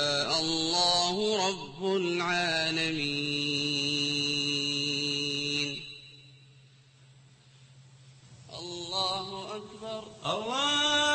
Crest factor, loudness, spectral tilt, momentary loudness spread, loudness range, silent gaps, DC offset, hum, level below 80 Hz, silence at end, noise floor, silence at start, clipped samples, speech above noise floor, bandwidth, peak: 18 dB; -28 LUFS; -2.5 dB/octave; 15 LU; 10 LU; none; under 0.1%; none; -64 dBFS; 0 s; -58 dBFS; 0 s; under 0.1%; 28 dB; 8.8 kHz; -14 dBFS